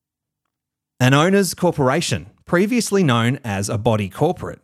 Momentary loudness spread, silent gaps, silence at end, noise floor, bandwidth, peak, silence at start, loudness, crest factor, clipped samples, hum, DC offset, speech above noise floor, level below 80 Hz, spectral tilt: 7 LU; none; 0.1 s; -83 dBFS; 15 kHz; 0 dBFS; 1 s; -18 LUFS; 18 dB; under 0.1%; none; under 0.1%; 65 dB; -50 dBFS; -5.5 dB/octave